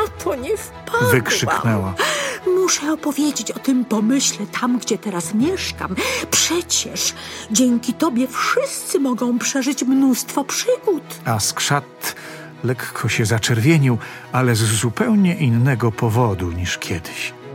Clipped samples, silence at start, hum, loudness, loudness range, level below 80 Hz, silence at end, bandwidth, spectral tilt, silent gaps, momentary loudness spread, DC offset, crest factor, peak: under 0.1%; 0 s; none; -19 LUFS; 2 LU; -48 dBFS; 0 s; 17 kHz; -4 dB/octave; none; 8 LU; under 0.1%; 18 dB; -2 dBFS